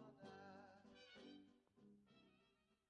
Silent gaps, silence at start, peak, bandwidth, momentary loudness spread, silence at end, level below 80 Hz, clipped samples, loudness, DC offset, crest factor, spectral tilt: none; 0 s; -48 dBFS; 8.8 kHz; 5 LU; 0.05 s; under -90 dBFS; under 0.1%; -63 LUFS; under 0.1%; 18 dB; -5 dB/octave